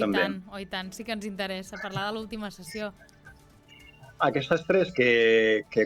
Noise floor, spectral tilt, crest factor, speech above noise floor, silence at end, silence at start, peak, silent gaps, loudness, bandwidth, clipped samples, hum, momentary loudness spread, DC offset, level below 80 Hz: -54 dBFS; -5 dB/octave; 18 dB; 27 dB; 0 s; 0 s; -10 dBFS; none; -27 LUFS; 15 kHz; under 0.1%; none; 16 LU; under 0.1%; -58 dBFS